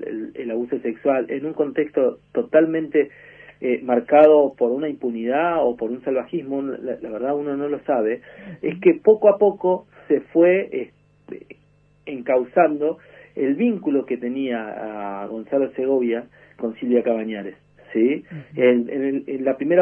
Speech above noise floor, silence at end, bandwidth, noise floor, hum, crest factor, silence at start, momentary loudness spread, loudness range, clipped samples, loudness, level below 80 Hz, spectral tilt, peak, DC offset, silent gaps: 37 dB; 0 s; 3.5 kHz; -57 dBFS; 50 Hz at -60 dBFS; 18 dB; 0 s; 14 LU; 5 LU; under 0.1%; -21 LUFS; -66 dBFS; -9.5 dB/octave; -2 dBFS; under 0.1%; none